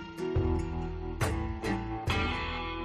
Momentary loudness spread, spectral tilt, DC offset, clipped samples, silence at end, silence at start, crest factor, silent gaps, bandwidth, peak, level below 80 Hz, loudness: 5 LU; -6 dB/octave; under 0.1%; under 0.1%; 0 s; 0 s; 16 dB; none; 13.5 kHz; -16 dBFS; -38 dBFS; -33 LUFS